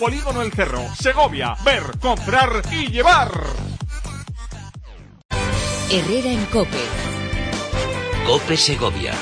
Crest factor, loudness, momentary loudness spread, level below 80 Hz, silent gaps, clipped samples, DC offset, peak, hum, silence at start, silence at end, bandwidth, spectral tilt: 16 dB; -19 LUFS; 14 LU; -30 dBFS; 5.25-5.29 s; under 0.1%; under 0.1%; -4 dBFS; none; 0 s; 0 s; 10.5 kHz; -4 dB/octave